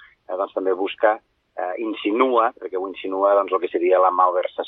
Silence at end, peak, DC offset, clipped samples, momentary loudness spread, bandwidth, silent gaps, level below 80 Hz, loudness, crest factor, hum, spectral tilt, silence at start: 0 s; -4 dBFS; under 0.1%; under 0.1%; 12 LU; 4 kHz; none; -72 dBFS; -21 LUFS; 16 dB; none; -6.5 dB/octave; 0.3 s